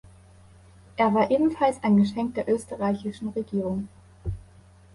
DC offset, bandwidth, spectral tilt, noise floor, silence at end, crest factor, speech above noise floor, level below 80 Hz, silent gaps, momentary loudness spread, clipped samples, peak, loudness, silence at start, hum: under 0.1%; 11.5 kHz; -7.5 dB/octave; -52 dBFS; 0.55 s; 18 dB; 28 dB; -48 dBFS; none; 16 LU; under 0.1%; -8 dBFS; -25 LUFS; 0.95 s; none